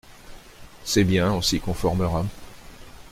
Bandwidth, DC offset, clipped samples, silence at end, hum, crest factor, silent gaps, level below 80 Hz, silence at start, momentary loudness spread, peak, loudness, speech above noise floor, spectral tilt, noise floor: 16 kHz; under 0.1%; under 0.1%; 0 s; none; 16 dB; none; -40 dBFS; 0.05 s; 13 LU; -8 dBFS; -23 LUFS; 22 dB; -5 dB/octave; -44 dBFS